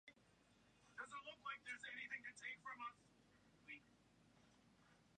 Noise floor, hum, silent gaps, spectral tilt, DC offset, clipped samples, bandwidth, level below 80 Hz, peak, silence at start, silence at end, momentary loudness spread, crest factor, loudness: -75 dBFS; none; none; -2 dB/octave; under 0.1%; under 0.1%; 10 kHz; -88 dBFS; -38 dBFS; 0.05 s; 0 s; 10 LU; 20 dB; -53 LUFS